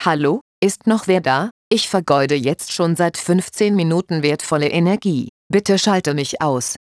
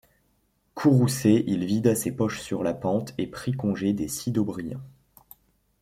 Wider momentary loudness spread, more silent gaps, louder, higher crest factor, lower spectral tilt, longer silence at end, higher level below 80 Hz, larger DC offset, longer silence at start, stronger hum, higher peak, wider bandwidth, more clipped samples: second, 4 LU vs 11 LU; first, 0.41-0.62 s, 1.51-1.71 s, 5.29-5.50 s vs none; first, -18 LUFS vs -25 LUFS; about the same, 16 dB vs 18 dB; second, -5 dB/octave vs -6.5 dB/octave; second, 0.2 s vs 0.9 s; about the same, -60 dBFS vs -58 dBFS; neither; second, 0 s vs 0.75 s; neither; first, -2 dBFS vs -8 dBFS; second, 11 kHz vs 16 kHz; neither